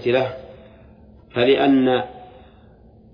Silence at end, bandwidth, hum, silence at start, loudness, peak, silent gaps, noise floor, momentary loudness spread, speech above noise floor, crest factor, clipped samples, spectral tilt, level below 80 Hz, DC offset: 0.9 s; 5.2 kHz; none; 0 s; -19 LUFS; -4 dBFS; none; -48 dBFS; 16 LU; 31 dB; 18 dB; under 0.1%; -8 dB/octave; -52 dBFS; under 0.1%